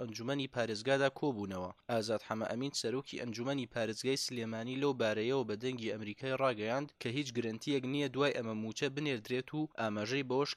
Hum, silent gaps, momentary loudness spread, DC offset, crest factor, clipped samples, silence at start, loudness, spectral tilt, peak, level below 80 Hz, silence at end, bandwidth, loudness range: none; none; 7 LU; under 0.1%; 18 dB; under 0.1%; 0 s; -36 LUFS; -5 dB/octave; -18 dBFS; -76 dBFS; 0 s; 15 kHz; 1 LU